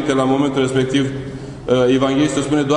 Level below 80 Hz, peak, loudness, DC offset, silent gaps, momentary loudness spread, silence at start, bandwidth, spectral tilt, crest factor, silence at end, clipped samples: -44 dBFS; -4 dBFS; -17 LUFS; under 0.1%; none; 12 LU; 0 s; 10.5 kHz; -5.5 dB/octave; 14 dB; 0 s; under 0.1%